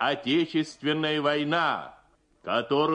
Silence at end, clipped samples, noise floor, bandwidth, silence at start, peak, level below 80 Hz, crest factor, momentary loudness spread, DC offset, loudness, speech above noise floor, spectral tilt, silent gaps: 0 s; under 0.1%; -59 dBFS; 10 kHz; 0 s; -12 dBFS; -70 dBFS; 16 dB; 8 LU; under 0.1%; -26 LUFS; 33 dB; -5.5 dB/octave; none